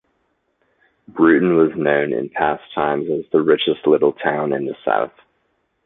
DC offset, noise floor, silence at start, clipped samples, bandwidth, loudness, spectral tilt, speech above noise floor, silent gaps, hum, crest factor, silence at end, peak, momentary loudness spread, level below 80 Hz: under 0.1%; -67 dBFS; 1.15 s; under 0.1%; 4 kHz; -18 LUFS; -10.5 dB/octave; 50 dB; none; none; 18 dB; 0.75 s; -2 dBFS; 8 LU; -58 dBFS